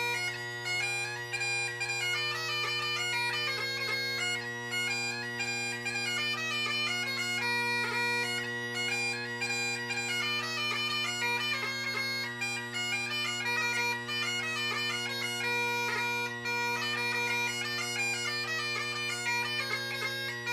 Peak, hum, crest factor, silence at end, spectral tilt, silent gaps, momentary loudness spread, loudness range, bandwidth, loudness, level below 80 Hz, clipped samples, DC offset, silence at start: -20 dBFS; none; 14 dB; 0 s; -2 dB/octave; none; 4 LU; 1 LU; 15.5 kHz; -31 LUFS; -74 dBFS; under 0.1%; under 0.1%; 0 s